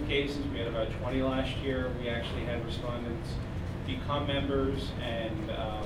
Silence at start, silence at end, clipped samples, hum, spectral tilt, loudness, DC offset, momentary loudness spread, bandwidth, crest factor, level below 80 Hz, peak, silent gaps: 0 s; 0 s; under 0.1%; none; -6.5 dB/octave; -33 LUFS; under 0.1%; 6 LU; 15 kHz; 16 dB; -42 dBFS; -16 dBFS; none